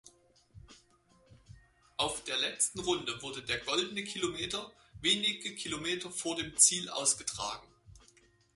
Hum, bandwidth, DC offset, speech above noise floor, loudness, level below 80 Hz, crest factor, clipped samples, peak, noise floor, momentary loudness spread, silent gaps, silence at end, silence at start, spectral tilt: none; 12 kHz; under 0.1%; 33 dB; -31 LUFS; -64 dBFS; 26 dB; under 0.1%; -10 dBFS; -66 dBFS; 14 LU; none; 0.55 s; 0.05 s; -1 dB/octave